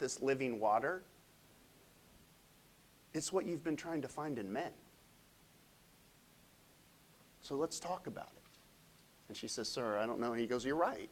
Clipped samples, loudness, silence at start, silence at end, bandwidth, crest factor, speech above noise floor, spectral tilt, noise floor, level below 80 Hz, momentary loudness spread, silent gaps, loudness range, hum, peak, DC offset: under 0.1%; -39 LUFS; 0 s; 0 s; 16 kHz; 22 dB; 27 dB; -4 dB/octave; -66 dBFS; -74 dBFS; 14 LU; none; 7 LU; none; -20 dBFS; under 0.1%